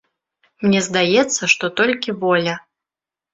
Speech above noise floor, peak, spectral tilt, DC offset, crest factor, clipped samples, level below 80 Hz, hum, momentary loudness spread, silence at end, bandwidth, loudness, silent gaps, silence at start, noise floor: 71 dB; -2 dBFS; -3.5 dB/octave; under 0.1%; 18 dB; under 0.1%; -60 dBFS; none; 7 LU; 0.75 s; 8 kHz; -17 LUFS; none; 0.6 s; -89 dBFS